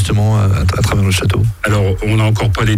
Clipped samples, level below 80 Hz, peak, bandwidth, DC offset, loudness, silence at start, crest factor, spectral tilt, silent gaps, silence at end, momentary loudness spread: under 0.1%; -26 dBFS; -2 dBFS; 15 kHz; under 0.1%; -14 LUFS; 0 s; 12 dB; -6 dB/octave; none; 0 s; 2 LU